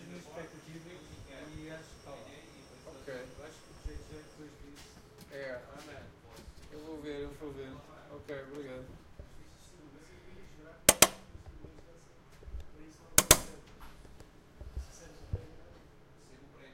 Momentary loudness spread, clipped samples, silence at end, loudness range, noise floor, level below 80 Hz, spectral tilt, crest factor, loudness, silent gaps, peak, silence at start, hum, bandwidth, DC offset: 29 LU; under 0.1%; 0 s; 19 LU; -57 dBFS; -52 dBFS; -1.5 dB/octave; 36 dB; -30 LUFS; none; -2 dBFS; 0 s; none; 16 kHz; under 0.1%